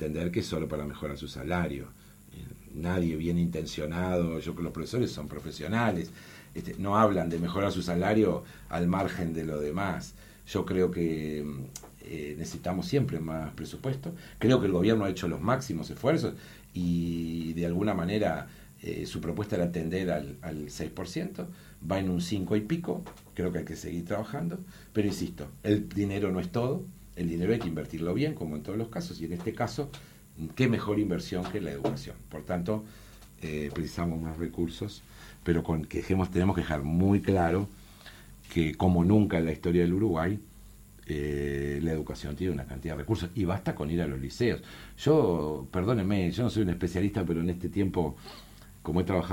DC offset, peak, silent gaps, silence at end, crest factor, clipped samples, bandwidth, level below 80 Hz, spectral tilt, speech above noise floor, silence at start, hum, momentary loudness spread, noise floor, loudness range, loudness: under 0.1%; -10 dBFS; none; 0 s; 20 dB; under 0.1%; 17 kHz; -48 dBFS; -7 dB/octave; 21 dB; 0 s; none; 15 LU; -51 dBFS; 5 LU; -30 LUFS